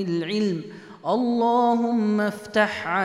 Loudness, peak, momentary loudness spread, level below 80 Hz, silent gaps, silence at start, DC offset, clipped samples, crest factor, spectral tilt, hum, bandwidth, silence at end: -23 LUFS; -6 dBFS; 9 LU; -68 dBFS; none; 0 s; under 0.1%; under 0.1%; 16 dB; -6 dB/octave; none; 12 kHz; 0 s